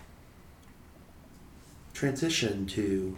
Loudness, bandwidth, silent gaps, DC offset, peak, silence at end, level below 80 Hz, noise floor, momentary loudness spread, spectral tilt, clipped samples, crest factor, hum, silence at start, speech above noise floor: -30 LUFS; 18.5 kHz; none; under 0.1%; -16 dBFS; 0 s; -54 dBFS; -53 dBFS; 25 LU; -4.5 dB/octave; under 0.1%; 18 dB; none; 0 s; 23 dB